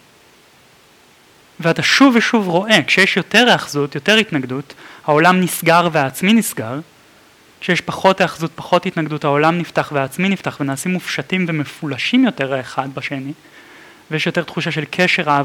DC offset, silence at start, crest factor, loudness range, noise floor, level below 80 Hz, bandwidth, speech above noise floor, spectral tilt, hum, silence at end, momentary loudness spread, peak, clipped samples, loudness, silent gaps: under 0.1%; 1.6 s; 18 dB; 7 LU; -49 dBFS; -62 dBFS; 18 kHz; 33 dB; -4.5 dB/octave; none; 0 s; 13 LU; 0 dBFS; under 0.1%; -16 LUFS; none